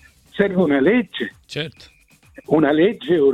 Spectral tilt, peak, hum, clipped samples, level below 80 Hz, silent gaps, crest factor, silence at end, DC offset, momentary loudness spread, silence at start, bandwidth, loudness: -7 dB/octave; -2 dBFS; none; under 0.1%; -54 dBFS; none; 16 dB; 0 s; under 0.1%; 13 LU; 0.35 s; 11.5 kHz; -19 LUFS